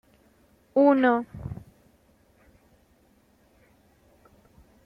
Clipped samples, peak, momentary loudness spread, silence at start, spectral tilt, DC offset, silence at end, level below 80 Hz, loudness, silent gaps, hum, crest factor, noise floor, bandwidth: under 0.1%; -8 dBFS; 21 LU; 0.75 s; -8 dB/octave; under 0.1%; 3.3 s; -58 dBFS; -23 LUFS; none; none; 22 dB; -62 dBFS; 5 kHz